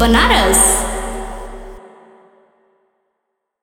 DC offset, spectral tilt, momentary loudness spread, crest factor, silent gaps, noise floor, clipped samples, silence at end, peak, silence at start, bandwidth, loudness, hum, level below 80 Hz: under 0.1%; -2.5 dB/octave; 23 LU; 18 dB; none; -74 dBFS; under 0.1%; 1.75 s; 0 dBFS; 0 s; 17.5 kHz; -12 LUFS; none; -26 dBFS